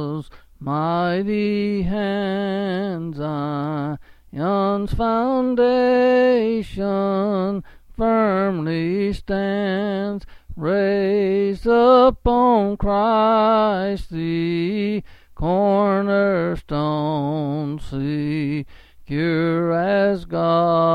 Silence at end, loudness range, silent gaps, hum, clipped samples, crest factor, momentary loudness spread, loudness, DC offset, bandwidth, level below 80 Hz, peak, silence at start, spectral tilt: 0 s; 6 LU; none; none; under 0.1%; 16 dB; 10 LU; -20 LUFS; under 0.1%; 10 kHz; -40 dBFS; -4 dBFS; 0 s; -8.5 dB/octave